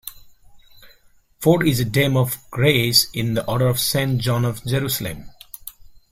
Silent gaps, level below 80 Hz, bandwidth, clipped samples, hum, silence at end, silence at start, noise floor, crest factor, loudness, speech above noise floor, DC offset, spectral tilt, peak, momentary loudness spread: none; -48 dBFS; 16.5 kHz; under 0.1%; none; 0.25 s; 0.05 s; -54 dBFS; 20 dB; -19 LUFS; 35 dB; under 0.1%; -4.5 dB/octave; -2 dBFS; 20 LU